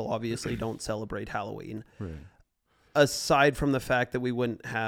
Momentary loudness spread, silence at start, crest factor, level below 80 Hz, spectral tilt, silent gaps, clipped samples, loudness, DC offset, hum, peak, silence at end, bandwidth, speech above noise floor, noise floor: 18 LU; 0 s; 22 dB; -50 dBFS; -5 dB/octave; none; under 0.1%; -28 LUFS; under 0.1%; none; -8 dBFS; 0 s; 17.5 kHz; 40 dB; -68 dBFS